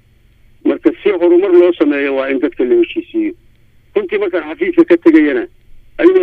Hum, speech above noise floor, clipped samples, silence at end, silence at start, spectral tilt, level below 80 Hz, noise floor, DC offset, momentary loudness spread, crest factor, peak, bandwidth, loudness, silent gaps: none; 36 dB; 0.1%; 0 s; 0.65 s; -7 dB/octave; -48 dBFS; -48 dBFS; under 0.1%; 11 LU; 12 dB; 0 dBFS; 4.3 kHz; -13 LUFS; none